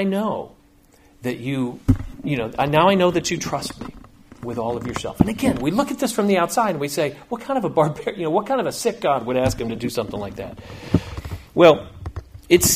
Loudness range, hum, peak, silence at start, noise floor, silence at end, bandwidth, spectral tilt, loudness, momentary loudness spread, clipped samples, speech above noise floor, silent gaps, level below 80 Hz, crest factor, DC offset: 2 LU; none; 0 dBFS; 0 s; -53 dBFS; 0 s; 15.5 kHz; -5 dB/octave; -21 LUFS; 17 LU; under 0.1%; 32 dB; none; -40 dBFS; 22 dB; under 0.1%